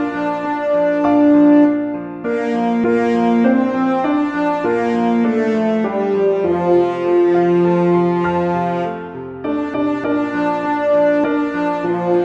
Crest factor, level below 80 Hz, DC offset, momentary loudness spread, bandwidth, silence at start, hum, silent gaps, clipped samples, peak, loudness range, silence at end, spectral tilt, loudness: 14 dB; -54 dBFS; under 0.1%; 7 LU; 7.6 kHz; 0 s; none; none; under 0.1%; -2 dBFS; 4 LU; 0 s; -8.5 dB/octave; -16 LUFS